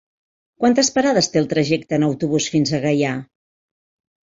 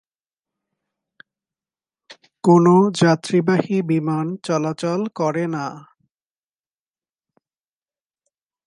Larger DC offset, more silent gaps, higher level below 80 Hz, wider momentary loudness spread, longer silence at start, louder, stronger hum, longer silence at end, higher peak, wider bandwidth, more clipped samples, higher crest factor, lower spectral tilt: neither; neither; first, -58 dBFS vs -70 dBFS; second, 4 LU vs 10 LU; second, 0.6 s vs 2.1 s; about the same, -18 LUFS vs -19 LUFS; neither; second, 1 s vs 2.85 s; about the same, -4 dBFS vs -2 dBFS; second, 7.8 kHz vs 11 kHz; neither; about the same, 16 dB vs 20 dB; second, -4.5 dB/octave vs -7 dB/octave